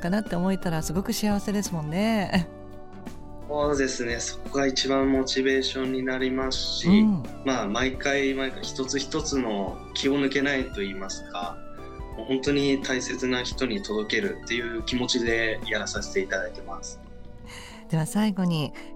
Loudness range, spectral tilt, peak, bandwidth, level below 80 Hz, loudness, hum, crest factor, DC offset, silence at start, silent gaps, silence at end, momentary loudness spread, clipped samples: 4 LU; -4.5 dB/octave; -8 dBFS; 16 kHz; -42 dBFS; -26 LUFS; none; 18 dB; under 0.1%; 0 s; none; 0 s; 15 LU; under 0.1%